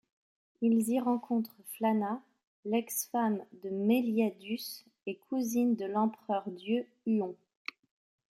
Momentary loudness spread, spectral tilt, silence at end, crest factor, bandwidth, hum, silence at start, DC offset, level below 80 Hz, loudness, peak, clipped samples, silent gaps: 14 LU; -5 dB/octave; 1 s; 16 dB; 16.5 kHz; none; 0.6 s; under 0.1%; -80 dBFS; -33 LUFS; -16 dBFS; under 0.1%; 2.47-2.63 s